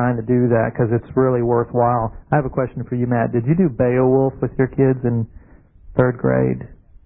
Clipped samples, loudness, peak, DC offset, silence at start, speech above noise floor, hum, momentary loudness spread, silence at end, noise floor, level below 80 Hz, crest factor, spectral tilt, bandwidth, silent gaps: under 0.1%; -18 LUFS; 0 dBFS; under 0.1%; 0 s; 25 dB; none; 7 LU; 0.3 s; -43 dBFS; -42 dBFS; 18 dB; -14.5 dB/octave; 3 kHz; none